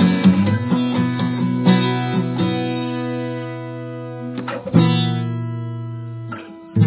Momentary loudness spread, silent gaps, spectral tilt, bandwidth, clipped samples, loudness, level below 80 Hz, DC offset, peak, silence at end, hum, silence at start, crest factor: 14 LU; none; -11.5 dB/octave; 4 kHz; under 0.1%; -20 LUFS; -50 dBFS; under 0.1%; 0 dBFS; 0 s; none; 0 s; 18 dB